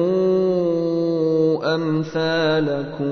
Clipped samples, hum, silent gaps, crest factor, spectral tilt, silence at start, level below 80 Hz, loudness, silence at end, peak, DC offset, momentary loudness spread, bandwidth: under 0.1%; none; none; 12 dB; -7.5 dB/octave; 0 s; -58 dBFS; -20 LUFS; 0 s; -8 dBFS; under 0.1%; 4 LU; 6.6 kHz